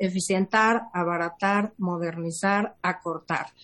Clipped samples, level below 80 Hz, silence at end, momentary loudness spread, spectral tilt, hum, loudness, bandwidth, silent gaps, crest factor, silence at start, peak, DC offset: under 0.1%; -68 dBFS; 0.15 s; 8 LU; -5 dB/octave; none; -26 LUFS; 12 kHz; none; 18 dB; 0 s; -8 dBFS; under 0.1%